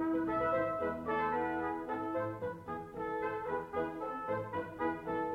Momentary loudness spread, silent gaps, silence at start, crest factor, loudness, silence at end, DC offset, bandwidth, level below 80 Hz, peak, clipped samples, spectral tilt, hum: 8 LU; none; 0 s; 14 dB; -37 LUFS; 0 s; under 0.1%; 13 kHz; -64 dBFS; -22 dBFS; under 0.1%; -8 dB/octave; none